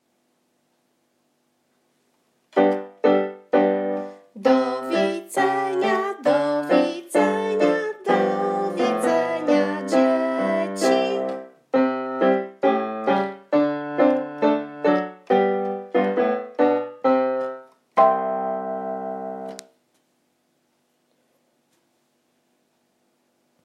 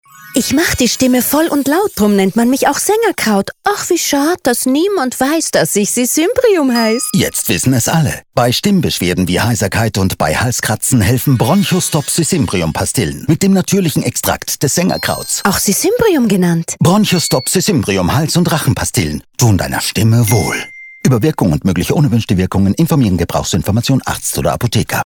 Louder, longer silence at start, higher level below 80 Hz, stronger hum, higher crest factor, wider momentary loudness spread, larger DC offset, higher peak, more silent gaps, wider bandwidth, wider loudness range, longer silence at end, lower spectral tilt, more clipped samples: second, -22 LUFS vs -13 LUFS; first, 2.55 s vs 0.2 s; second, -82 dBFS vs -36 dBFS; neither; first, 18 dB vs 12 dB; first, 8 LU vs 4 LU; neither; second, -4 dBFS vs 0 dBFS; neither; second, 14.5 kHz vs over 20 kHz; first, 4 LU vs 1 LU; first, 4.05 s vs 0 s; about the same, -5.5 dB/octave vs -4.5 dB/octave; neither